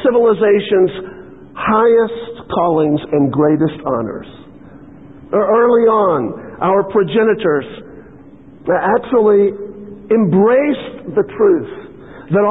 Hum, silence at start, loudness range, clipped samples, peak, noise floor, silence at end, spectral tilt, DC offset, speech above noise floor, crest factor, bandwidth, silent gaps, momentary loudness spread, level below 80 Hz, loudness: none; 0 s; 2 LU; under 0.1%; -2 dBFS; -39 dBFS; 0 s; -11 dB/octave; 0.4%; 26 dB; 12 dB; 4 kHz; none; 17 LU; -50 dBFS; -14 LUFS